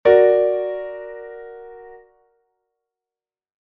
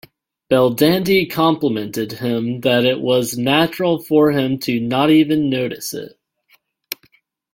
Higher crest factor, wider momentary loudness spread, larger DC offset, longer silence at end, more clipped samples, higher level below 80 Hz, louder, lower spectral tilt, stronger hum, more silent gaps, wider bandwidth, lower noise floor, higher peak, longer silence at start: about the same, 20 dB vs 16 dB; first, 25 LU vs 13 LU; neither; first, 1.85 s vs 0.6 s; neither; about the same, -60 dBFS vs -56 dBFS; about the same, -17 LUFS vs -17 LUFS; first, -8 dB/octave vs -5.5 dB/octave; neither; neither; second, 4.5 kHz vs 17 kHz; first, under -90 dBFS vs -59 dBFS; about the same, -2 dBFS vs -2 dBFS; second, 0.05 s vs 0.5 s